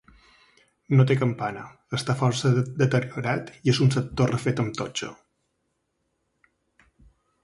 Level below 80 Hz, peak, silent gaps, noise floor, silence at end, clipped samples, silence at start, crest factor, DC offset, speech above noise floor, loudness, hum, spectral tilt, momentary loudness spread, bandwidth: -56 dBFS; -6 dBFS; none; -75 dBFS; 2.3 s; under 0.1%; 0.9 s; 20 dB; under 0.1%; 52 dB; -24 LUFS; none; -6 dB/octave; 11 LU; 11.5 kHz